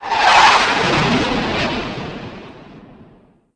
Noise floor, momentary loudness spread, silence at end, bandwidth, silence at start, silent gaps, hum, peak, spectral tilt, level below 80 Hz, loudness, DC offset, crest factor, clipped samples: -49 dBFS; 21 LU; 0.75 s; 10.5 kHz; 0 s; none; none; 0 dBFS; -3.5 dB/octave; -40 dBFS; -14 LUFS; under 0.1%; 16 dB; under 0.1%